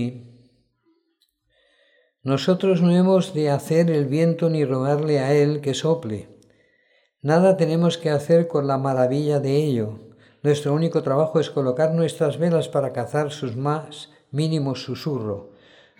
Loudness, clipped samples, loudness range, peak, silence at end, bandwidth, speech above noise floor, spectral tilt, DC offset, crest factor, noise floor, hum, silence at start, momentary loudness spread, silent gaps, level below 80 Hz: -21 LUFS; under 0.1%; 4 LU; -6 dBFS; 0.55 s; 12.5 kHz; 49 dB; -7 dB/octave; under 0.1%; 16 dB; -69 dBFS; none; 0 s; 10 LU; none; -68 dBFS